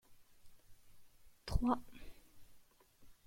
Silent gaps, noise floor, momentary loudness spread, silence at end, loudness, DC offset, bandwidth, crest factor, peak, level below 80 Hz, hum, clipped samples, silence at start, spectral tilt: none; -64 dBFS; 23 LU; 0.15 s; -39 LUFS; under 0.1%; 16.5 kHz; 24 dB; -20 dBFS; -52 dBFS; none; under 0.1%; 0.1 s; -7 dB/octave